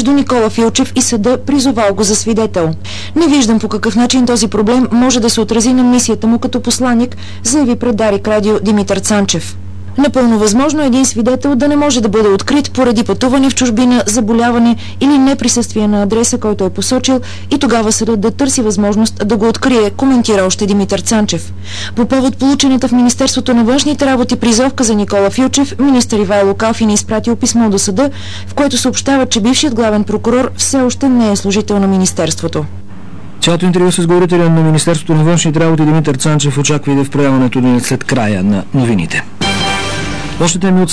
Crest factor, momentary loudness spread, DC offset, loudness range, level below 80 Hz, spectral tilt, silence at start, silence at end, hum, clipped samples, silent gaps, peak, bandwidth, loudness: 10 dB; 5 LU; 4%; 2 LU; -38 dBFS; -4.5 dB/octave; 0 s; 0 s; none; under 0.1%; none; -2 dBFS; 11 kHz; -11 LUFS